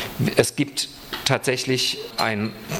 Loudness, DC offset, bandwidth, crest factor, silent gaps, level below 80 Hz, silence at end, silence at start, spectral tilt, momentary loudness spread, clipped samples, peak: -23 LUFS; under 0.1%; 19.5 kHz; 20 dB; none; -52 dBFS; 0 s; 0 s; -3.5 dB/octave; 7 LU; under 0.1%; -4 dBFS